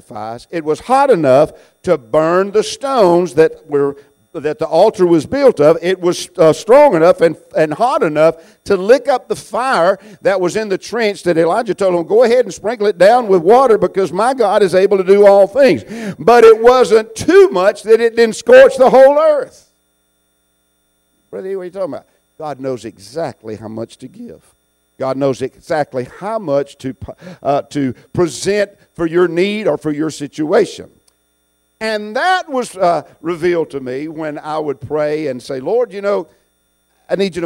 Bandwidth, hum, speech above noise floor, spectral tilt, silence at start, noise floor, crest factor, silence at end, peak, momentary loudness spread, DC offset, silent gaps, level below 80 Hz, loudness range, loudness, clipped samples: 15 kHz; none; 49 dB; -5.5 dB/octave; 0.1 s; -62 dBFS; 14 dB; 0 s; 0 dBFS; 16 LU; under 0.1%; none; -52 dBFS; 13 LU; -13 LUFS; under 0.1%